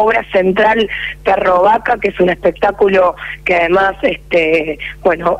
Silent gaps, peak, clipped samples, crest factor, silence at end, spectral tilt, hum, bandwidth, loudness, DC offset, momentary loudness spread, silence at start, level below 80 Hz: none; -2 dBFS; under 0.1%; 10 dB; 0 s; -6.5 dB/octave; none; 11.5 kHz; -13 LUFS; under 0.1%; 6 LU; 0 s; -38 dBFS